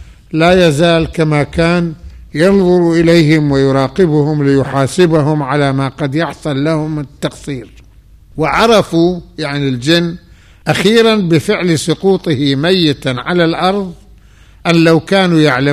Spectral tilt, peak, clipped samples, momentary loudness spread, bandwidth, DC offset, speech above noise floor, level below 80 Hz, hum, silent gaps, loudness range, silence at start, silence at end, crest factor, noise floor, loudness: -6 dB/octave; 0 dBFS; under 0.1%; 12 LU; 14.5 kHz; 0.2%; 30 dB; -36 dBFS; none; none; 4 LU; 0 s; 0 s; 12 dB; -41 dBFS; -12 LUFS